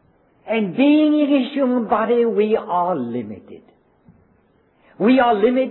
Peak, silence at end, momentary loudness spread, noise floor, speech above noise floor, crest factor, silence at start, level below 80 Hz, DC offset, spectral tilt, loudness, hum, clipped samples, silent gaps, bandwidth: -4 dBFS; 0 s; 10 LU; -58 dBFS; 41 dB; 14 dB; 0.45 s; -60 dBFS; under 0.1%; -10 dB/octave; -18 LUFS; none; under 0.1%; none; 4.2 kHz